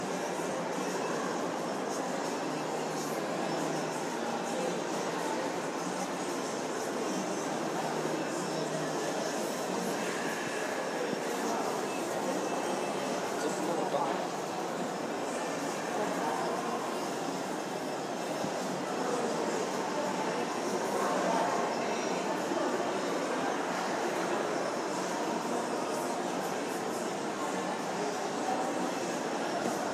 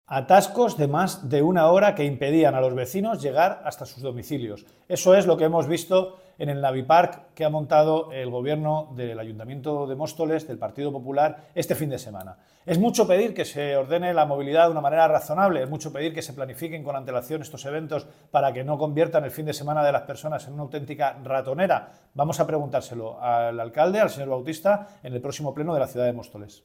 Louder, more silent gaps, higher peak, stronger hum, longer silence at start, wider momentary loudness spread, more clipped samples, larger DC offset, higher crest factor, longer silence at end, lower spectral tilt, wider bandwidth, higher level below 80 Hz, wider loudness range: second, -33 LUFS vs -24 LUFS; neither; second, -16 dBFS vs -4 dBFS; neither; about the same, 0 s vs 0.1 s; second, 3 LU vs 14 LU; neither; neither; about the same, 16 dB vs 20 dB; second, 0 s vs 0.15 s; second, -3.5 dB/octave vs -6 dB/octave; about the same, 16 kHz vs 16.5 kHz; second, -82 dBFS vs -64 dBFS; second, 2 LU vs 6 LU